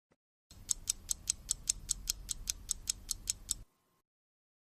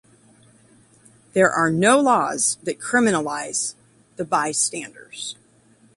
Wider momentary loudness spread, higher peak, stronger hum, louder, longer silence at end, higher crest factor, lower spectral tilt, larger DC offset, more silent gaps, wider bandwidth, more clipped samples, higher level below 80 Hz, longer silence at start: second, 4 LU vs 16 LU; second, -8 dBFS vs -4 dBFS; neither; second, -37 LUFS vs -20 LUFS; first, 1.15 s vs 0.65 s; first, 32 dB vs 18 dB; second, 0.5 dB/octave vs -3.5 dB/octave; neither; neither; first, 15.5 kHz vs 11.5 kHz; neither; first, -54 dBFS vs -64 dBFS; second, 0.5 s vs 1.35 s